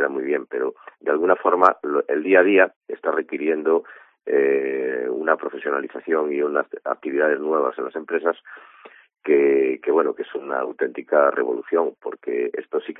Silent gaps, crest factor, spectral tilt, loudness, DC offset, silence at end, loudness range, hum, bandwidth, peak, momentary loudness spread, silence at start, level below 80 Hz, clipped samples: 2.76-2.81 s; 22 dB; -7.5 dB/octave; -21 LUFS; under 0.1%; 0.05 s; 4 LU; none; 3.8 kHz; 0 dBFS; 11 LU; 0 s; -78 dBFS; under 0.1%